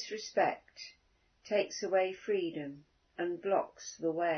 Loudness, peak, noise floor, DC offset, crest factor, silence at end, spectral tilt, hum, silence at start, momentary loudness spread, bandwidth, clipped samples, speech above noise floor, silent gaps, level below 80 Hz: -35 LUFS; -18 dBFS; -69 dBFS; under 0.1%; 18 dB; 0 s; -3 dB/octave; none; 0 s; 17 LU; 6.4 kHz; under 0.1%; 35 dB; none; -78 dBFS